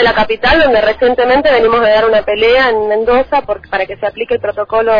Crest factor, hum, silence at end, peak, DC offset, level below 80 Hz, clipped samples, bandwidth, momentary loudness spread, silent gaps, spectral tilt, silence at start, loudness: 10 dB; none; 0 s; 0 dBFS; under 0.1%; -34 dBFS; under 0.1%; 5.2 kHz; 8 LU; none; -6 dB/octave; 0 s; -11 LUFS